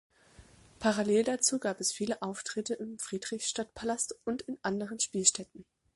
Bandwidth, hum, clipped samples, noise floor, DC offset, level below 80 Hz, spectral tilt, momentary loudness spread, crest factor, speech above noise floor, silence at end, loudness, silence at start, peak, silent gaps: 12 kHz; none; under 0.1%; -59 dBFS; under 0.1%; -66 dBFS; -2.5 dB/octave; 11 LU; 24 dB; 26 dB; 0.35 s; -32 LUFS; 0.4 s; -10 dBFS; none